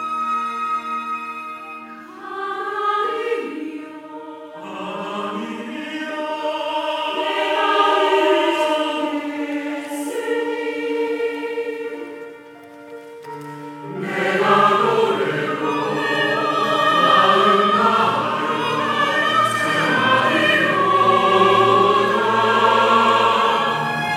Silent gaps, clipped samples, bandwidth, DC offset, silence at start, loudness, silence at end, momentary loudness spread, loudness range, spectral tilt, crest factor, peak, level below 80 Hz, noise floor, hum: none; under 0.1%; 16 kHz; under 0.1%; 0 s; -18 LUFS; 0 s; 19 LU; 11 LU; -4.5 dB/octave; 16 dB; -2 dBFS; -70 dBFS; -40 dBFS; none